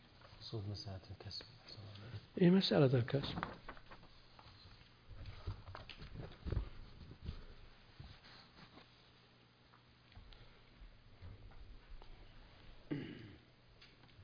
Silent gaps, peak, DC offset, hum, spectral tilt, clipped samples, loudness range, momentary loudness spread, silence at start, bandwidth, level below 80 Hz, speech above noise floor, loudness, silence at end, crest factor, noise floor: none; -20 dBFS; under 0.1%; 60 Hz at -65 dBFS; -6 dB/octave; under 0.1%; 24 LU; 28 LU; 0.05 s; 5.2 kHz; -58 dBFS; 31 dB; -40 LUFS; 0 s; 24 dB; -67 dBFS